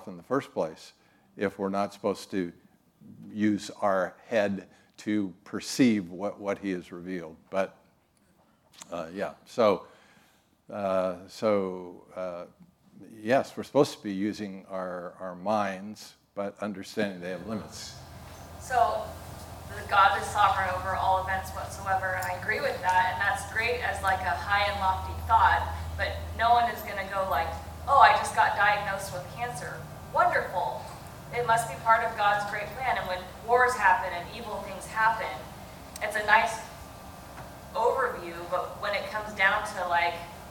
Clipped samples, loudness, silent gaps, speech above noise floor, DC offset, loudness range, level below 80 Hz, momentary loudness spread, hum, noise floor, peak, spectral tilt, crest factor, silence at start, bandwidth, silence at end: under 0.1%; -28 LUFS; none; 37 dB; under 0.1%; 8 LU; -52 dBFS; 17 LU; none; -65 dBFS; -6 dBFS; -4.5 dB/octave; 24 dB; 0 s; 18 kHz; 0 s